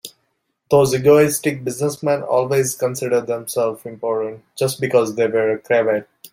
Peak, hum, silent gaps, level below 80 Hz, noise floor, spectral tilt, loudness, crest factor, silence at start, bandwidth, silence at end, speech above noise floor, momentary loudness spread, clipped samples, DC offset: -2 dBFS; none; none; -58 dBFS; -70 dBFS; -5 dB/octave; -18 LUFS; 16 dB; 0.05 s; 16.5 kHz; 0.05 s; 52 dB; 10 LU; under 0.1%; under 0.1%